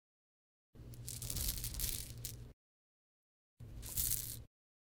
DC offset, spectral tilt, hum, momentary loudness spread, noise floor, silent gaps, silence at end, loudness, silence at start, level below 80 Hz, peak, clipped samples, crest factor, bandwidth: under 0.1%; -2 dB/octave; none; 20 LU; under -90 dBFS; 2.53-3.57 s; 0.5 s; -40 LUFS; 0.75 s; -52 dBFS; -14 dBFS; under 0.1%; 32 dB; 19 kHz